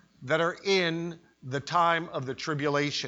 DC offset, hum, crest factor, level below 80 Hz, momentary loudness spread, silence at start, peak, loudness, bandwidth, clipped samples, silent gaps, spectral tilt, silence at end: under 0.1%; none; 18 dB; -68 dBFS; 11 LU; 0.2 s; -10 dBFS; -28 LUFS; 8 kHz; under 0.1%; none; -4.5 dB/octave; 0 s